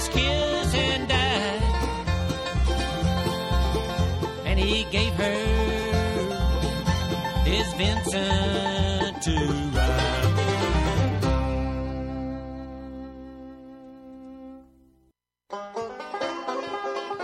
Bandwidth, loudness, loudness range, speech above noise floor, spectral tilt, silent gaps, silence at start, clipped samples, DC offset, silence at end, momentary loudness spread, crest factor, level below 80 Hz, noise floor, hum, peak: 14 kHz; -25 LUFS; 13 LU; 44 dB; -5 dB/octave; none; 0 s; under 0.1%; under 0.1%; 0 s; 16 LU; 18 dB; -30 dBFS; -67 dBFS; none; -8 dBFS